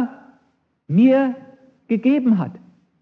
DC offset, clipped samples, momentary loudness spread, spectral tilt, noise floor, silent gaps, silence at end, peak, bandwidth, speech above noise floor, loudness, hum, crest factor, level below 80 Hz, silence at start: under 0.1%; under 0.1%; 14 LU; -10 dB/octave; -65 dBFS; none; 0.45 s; -4 dBFS; 4.3 kHz; 48 dB; -18 LUFS; none; 16 dB; -76 dBFS; 0 s